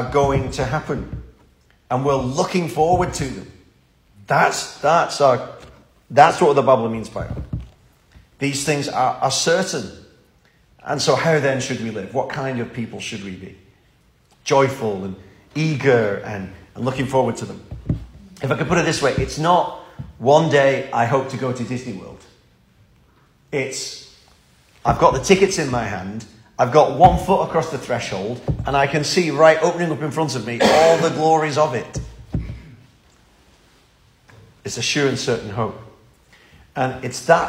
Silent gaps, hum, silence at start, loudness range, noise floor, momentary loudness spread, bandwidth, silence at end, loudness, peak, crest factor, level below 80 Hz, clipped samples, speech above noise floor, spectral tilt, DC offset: none; none; 0 s; 8 LU; -56 dBFS; 17 LU; 16 kHz; 0 s; -19 LUFS; 0 dBFS; 20 dB; -42 dBFS; under 0.1%; 38 dB; -5 dB/octave; under 0.1%